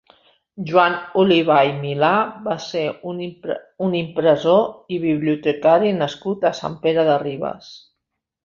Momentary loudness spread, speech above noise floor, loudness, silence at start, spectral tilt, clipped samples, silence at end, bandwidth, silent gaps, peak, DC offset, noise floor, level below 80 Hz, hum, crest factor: 13 LU; 61 dB; -19 LUFS; 0.55 s; -6.5 dB/octave; under 0.1%; 0.7 s; 7.2 kHz; none; -2 dBFS; under 0.1%; -79 dBFS; -62 dBFS; none; 18 dB